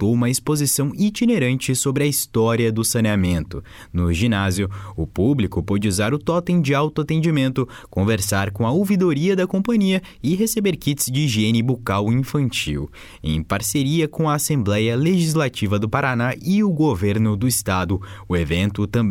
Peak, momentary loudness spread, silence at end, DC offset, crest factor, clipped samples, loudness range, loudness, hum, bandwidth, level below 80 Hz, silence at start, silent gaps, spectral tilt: -6 dBFS; 6 LU; 0 s; under 0.1%; 14 dB; under 0.1%; 2 LU; -20 LUFS; none; 17 kHz; -40 dBFS; 0 s; none; -5.5 dB/octave